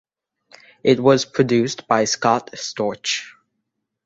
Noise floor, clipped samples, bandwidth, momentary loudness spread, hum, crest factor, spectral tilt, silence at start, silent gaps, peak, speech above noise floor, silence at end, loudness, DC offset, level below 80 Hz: -77 dBFS; under 0.1%; 8 kHz; 9 LU; none; 20 dB; -4 dB/octave; 0.85 s; none; -2 dBFS; 58 dB; 0.75 s; -19 LUFS; under 0.1%; -60 dBFS